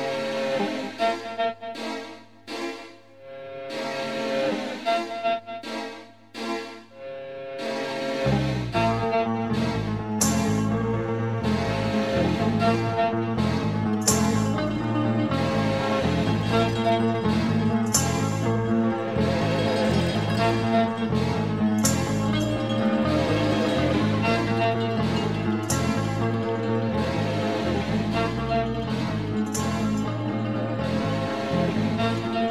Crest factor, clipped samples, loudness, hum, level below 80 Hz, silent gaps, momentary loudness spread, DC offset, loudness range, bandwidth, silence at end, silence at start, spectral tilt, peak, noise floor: 18 dB; under 0.1%; -25 LUFS; none; -46 dBFS; none; 10 LU; 0.2%; 7 LU; 14 kHz; 0 s; 0 s; -5.5 dB/octave; -6 dBFS; -45 dBFS